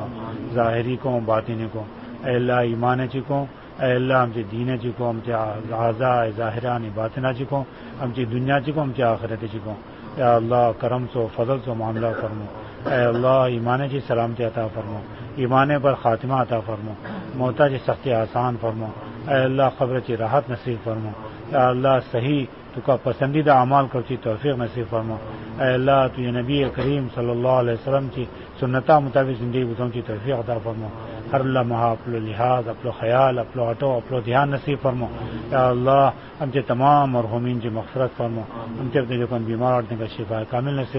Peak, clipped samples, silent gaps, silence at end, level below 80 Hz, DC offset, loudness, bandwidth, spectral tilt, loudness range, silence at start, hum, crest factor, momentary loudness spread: -4 dBFS; under 0.1%; none; 0 s; -48 dBFS; 0.1%; -22 LUFS; 5.8 kHz; -12 dB/octave; 3 LU; 0 s; none; 18 dB; 13 LU